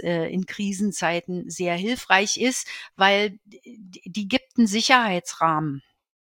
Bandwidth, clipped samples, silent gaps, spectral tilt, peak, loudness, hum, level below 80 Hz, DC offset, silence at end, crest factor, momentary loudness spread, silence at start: 17 kHz; under 0.1%; none; -3.5 dB/octave; -2 dBFS; -22 LUFS; none; -64 dBFS; under 0.1%; 0.5 s; 22 dB; 13 LU; 0 s